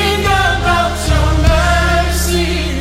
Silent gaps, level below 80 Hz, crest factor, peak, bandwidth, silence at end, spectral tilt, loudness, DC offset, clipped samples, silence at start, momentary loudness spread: none; -16 dBFS; 12 dB; 0 dBFS; 16 kHz; 0 s; -4.5 dB/octave; -13 LUFS; under 0.1%; under 0.1%; 0 s; 3 LU